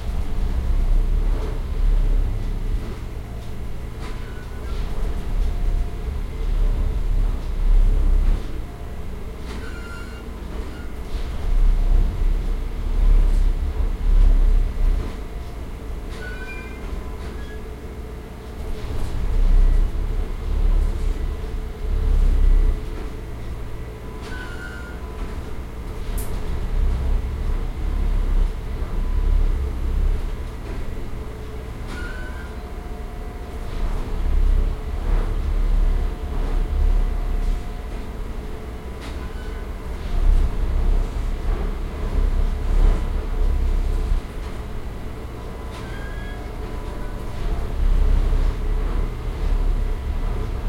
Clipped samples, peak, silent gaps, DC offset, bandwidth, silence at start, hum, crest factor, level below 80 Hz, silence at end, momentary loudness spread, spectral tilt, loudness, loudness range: under 0.1%; -6 dBFS; none; under 0.1%; 6.4 kHz; 0 s; none; 16 dB; -20 dBFS; 0 s; 11 LU; -7 dB/octave; -27 LUFS; 7 LU